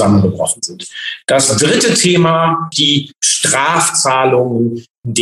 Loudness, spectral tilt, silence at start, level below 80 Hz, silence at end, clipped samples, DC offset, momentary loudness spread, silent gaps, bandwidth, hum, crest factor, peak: -12 LUFS; -3.5 dB/octave; 0 s; -48 dBFS; 0 s; under 0.1%; under 0.1%; 10 LU; 4.90-5.02 s; 13 kHz; none; 12 dB; -2 dBFS